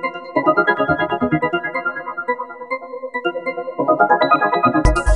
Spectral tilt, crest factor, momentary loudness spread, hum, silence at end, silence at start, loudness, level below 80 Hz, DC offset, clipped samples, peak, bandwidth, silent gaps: -6 dB/octave; 16 dB; 12 LU; none; 0 s; 0 s; -18 LUFS; -30 dBFS; 0.1%; under 0.1%; -2 dBFS; 11.5 kHz; none